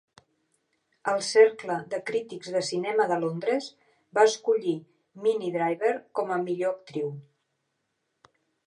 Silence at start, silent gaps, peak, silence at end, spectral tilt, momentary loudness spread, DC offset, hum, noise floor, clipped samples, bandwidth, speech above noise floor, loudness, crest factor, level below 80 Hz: 1.05 s; none; -6 dBFS; 1.45 s; -4.5 dB/octave; 12 LU; under 0.1%; none; -78 dBFS; under 0.1%; 11 kHz; 52 dB; -27 LUFS; 20 dB; -84 dBFS